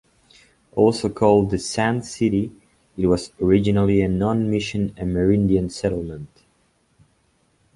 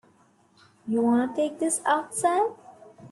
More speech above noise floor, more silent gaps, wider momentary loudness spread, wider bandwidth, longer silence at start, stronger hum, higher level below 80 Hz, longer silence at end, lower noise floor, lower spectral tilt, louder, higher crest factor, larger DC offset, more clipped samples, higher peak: first, 44 dB vs 36 dB; neither; about the same, 9 LU vs 7 LU; about the same, 11.5 kHz vs 12.5 kHz; about the same, 0.75 s vs 0.85 s; neither; first, -42 dBFS vs -74 dBFS; first, 1.5 s vs 0.05 s; about the same, -63 dBFS vs -61 dBFS; first, -6.5 dB/octave vs -3.5 dB/octave; first, -21 LUFS vs -25 LUFS; about the same, 18 dB vs 16 dB; neither; neither; first, -2 dBFS vs -10 dBFS